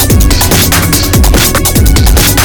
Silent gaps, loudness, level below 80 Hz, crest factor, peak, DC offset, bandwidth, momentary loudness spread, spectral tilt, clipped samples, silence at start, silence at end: none; -7 LUFS; -10 dBFS; 6 dB; 0 dBFS; under 0.1%; 19.5 kHz; 1 LU; -3.5 dB/octave; 0.3%; 0 s; 0 s